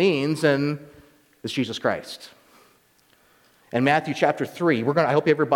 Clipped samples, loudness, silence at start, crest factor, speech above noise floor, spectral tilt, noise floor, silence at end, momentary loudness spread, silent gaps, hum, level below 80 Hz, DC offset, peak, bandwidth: under 0.1%; -23 LUFS; 0 s; 18 dB; 38 dB; -6 dB/octave; -60 dBFS; 0 s; 12 LU; none; none; -66 dBFS; under 0.1%; -6 dBFS; 18 kHz